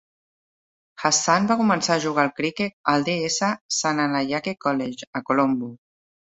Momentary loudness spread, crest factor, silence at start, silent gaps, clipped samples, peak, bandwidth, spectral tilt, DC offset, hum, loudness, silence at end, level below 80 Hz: 7 LU; 20 dB; 1 s; 2.73-2.84 s, 3.61-3.69 s, 5.07-5.13 s; under 0.1%; -4 dBFS; 8.4 kHz; -3.5 dB/octave; under 0.1%; none; -22 LUFS; 0.55 s; -66 dBFS